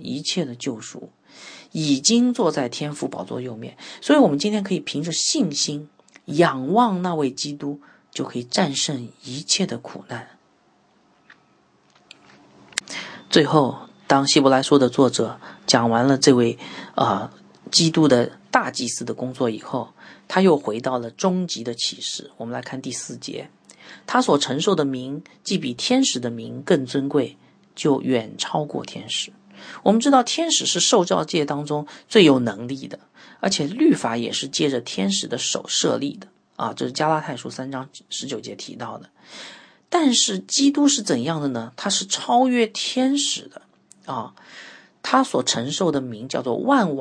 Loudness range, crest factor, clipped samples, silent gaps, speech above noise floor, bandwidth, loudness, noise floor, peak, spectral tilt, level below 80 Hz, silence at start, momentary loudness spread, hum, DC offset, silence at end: 7 LU; 22 dB; under 0.1%; none; 39 dB; 10.5 kHz; -21 LUFS; -60 dBFS; 0 dBFS; -4 dB/octave; -68 dBFS; 0 s; 17 LU; none; under 0.1%; 0 s